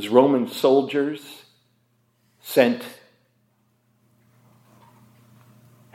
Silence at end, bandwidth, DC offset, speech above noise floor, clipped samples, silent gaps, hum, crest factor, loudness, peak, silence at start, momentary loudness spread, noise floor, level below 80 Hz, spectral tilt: 3 s; 16 kHz; under 0.1%; 46 dB; under 0.1%; none; none; 22 dB; -21 LUFS; -2 dBFS; 0 s; 25 LU; -66 dBFS; -80 dBFS; -5.5 dB/octave